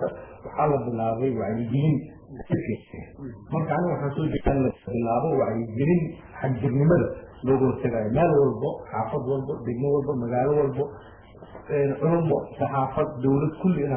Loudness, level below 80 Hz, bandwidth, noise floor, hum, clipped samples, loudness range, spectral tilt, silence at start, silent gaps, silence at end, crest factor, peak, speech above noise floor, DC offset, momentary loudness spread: -25 LUFS; -46 dBFS; 3.5 kHz; -45 dBFS; none; under 0.1%; 4 LU; -13 dB/octave; 0 s; none; 0 s; 16 dB; -8 dBFS; 20 dB; under 0.1%; 10 LU